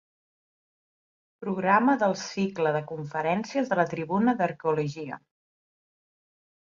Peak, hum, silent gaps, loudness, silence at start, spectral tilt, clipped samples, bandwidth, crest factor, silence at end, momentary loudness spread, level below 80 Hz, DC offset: -10 dBFS; none; none; -26 LUFS; 1.4 s; -6 dB/octave; under 0.1%; 7.6 kHz; 18 dB; 1.45 s; 11 LU; -70 dBFS; under 0.1%